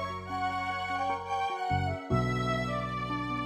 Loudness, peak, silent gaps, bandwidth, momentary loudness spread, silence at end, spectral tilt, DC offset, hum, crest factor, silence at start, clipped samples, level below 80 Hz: -32 LUFS; -14 dBFS; none; 13.5 kHz; 4 LU; 0 s; -6 dB/octave; under 0.1%; none; 18 dB; 0 s; under 0.1%; -50 dBFS